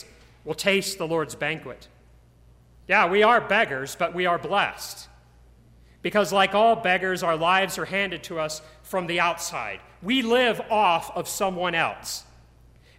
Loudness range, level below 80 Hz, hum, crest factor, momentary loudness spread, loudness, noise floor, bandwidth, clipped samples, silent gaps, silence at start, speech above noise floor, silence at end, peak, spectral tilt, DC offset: 2 LU; -56 dBFS; none; 18 dB; 14 LU; -23 LUFS; -54 dBFS; 16 kHz; under 0.1%; none; 0.45 s; 31 dB; 0.75 s; -6 dBFS; -3.5 dB/octave; under 0.1%